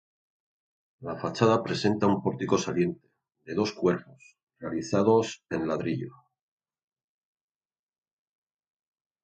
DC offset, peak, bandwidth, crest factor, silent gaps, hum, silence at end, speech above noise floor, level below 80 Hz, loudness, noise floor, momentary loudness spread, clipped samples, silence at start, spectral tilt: under 0.1%; -6 dBFS; 8.8 kHz; 24 dB; 4.43-4.47 s; none; 3.15 s; over 63 dB; -62 dBFS; -27 LUFS; under -90 dBFS; 12 LU; under 0.1%; 1 s; -6 dB/octave